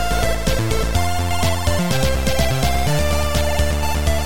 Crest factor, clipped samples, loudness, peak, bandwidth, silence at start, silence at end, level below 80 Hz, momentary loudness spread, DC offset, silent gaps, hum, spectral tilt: 12 dB; under 0.1%; -19 LUFS; -4 dBFS; 17 kHz; 0 s; 0 s; -24 dBFS; 2 LU; 7%; none; none; -4.5 dB/octave